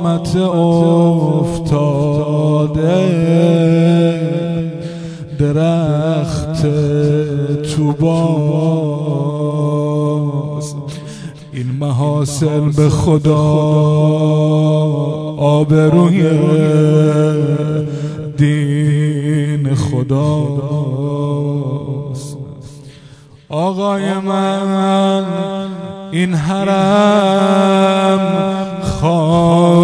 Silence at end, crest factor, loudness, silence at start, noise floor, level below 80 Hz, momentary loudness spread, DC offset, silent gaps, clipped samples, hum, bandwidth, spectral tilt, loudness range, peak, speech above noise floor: 0 s; 14 dB; -14 LUFS; 0 s; -40 dBFS; -42 dBFS; 11 LU; under 0.1%; none; under 0.1%; none; 11 kHz; -7.5 dB/octave; 6 LU; 0 dBFS; 27 dB